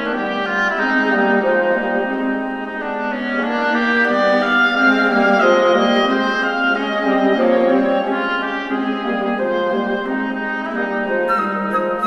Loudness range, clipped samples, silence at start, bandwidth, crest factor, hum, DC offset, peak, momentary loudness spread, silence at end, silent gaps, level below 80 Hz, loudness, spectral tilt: 5 LU; under 0.1%; 0 s; 8.8 kHz; 16 dB; none; under 0.1%; -2 dBFS; 8 LU; 0 s; none; -54 dBFS; -17 LUFS; -5.5 dB/octave